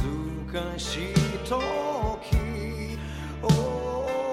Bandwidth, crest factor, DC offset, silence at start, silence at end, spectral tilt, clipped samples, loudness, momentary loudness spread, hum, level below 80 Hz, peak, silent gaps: 15.5 kHz; 18 dB; under 0.1%; 0 s; 0 s; -6 dB/octave; under 0.1%; -28 LUFS; 9 LU; none; -36 dBFS; -10 dBFS; none